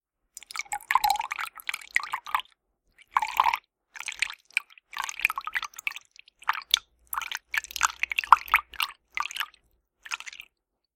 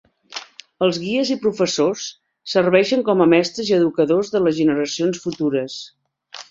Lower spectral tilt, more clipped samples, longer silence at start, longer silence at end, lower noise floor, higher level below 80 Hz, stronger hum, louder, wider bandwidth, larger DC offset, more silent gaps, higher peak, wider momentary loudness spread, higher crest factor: second, 2.5 dB/octave vs -5 dB/octave; neither; first, 0.55 s vs 0.3 s; first, 0.6 s vs 0.1 s; first, -72 dBFS vs -41 dBFS; about the same, -62 dBFS vs -62 dBFS; neither; second, -28 LUFS vs -19 LUFS; first, 17 kHz vs 7.8 kHz; neither; neither; about the same, 0 dBFS vs -2 dBFS; second, 12 LU vs 18 LU; first, 30 dB vs 18 dB